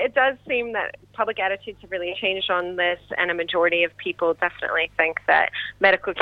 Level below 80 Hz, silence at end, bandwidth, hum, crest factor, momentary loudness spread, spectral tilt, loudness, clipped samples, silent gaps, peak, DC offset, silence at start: -58 dBFS; 0 s; 5.4 kHz; 50 Hz at -55 dBFS; 20 dB; 9 LU; -5.5 dB/octave; -22 LUFS; under 0.1%; none; -4 dBFS; under 0.1%; 0 s